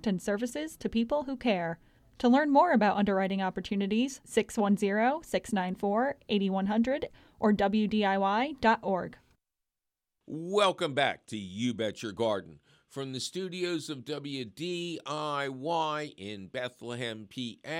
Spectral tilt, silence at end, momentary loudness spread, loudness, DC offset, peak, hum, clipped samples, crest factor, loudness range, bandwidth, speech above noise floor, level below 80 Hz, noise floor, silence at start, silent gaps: -5.5 dB/octave; 0 s; 12 LU; -30 LUFS; under 0.1%; -12 dBFS; none; under 0.1%; 18 dB; 7 LU; 14 kHz; 58 dB; -62 dBFS; -88 dBFS; 0.05 s; none